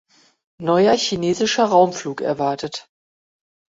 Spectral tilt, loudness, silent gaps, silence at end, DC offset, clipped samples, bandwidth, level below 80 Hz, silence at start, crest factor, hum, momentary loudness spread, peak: -4.5 dB/octave; -19 LUFS; none; 0.9 s; under 0.1%; under 0.1%; 7.8 kHz; -60 dBFS; 0.6 s; 18 dB; none; 12 LU; -2 dBFS